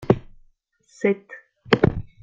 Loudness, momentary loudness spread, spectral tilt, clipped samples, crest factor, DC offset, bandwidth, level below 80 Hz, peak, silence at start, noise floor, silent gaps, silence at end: -23 LUFS; 19 LU; -7.5 dB/octave; under 0.1%; 22 dB; under 0.1%; 7.6 kHz; -44 dBFS; -2 dBFS; 0 s; -60 dBFS; none; 0.2 s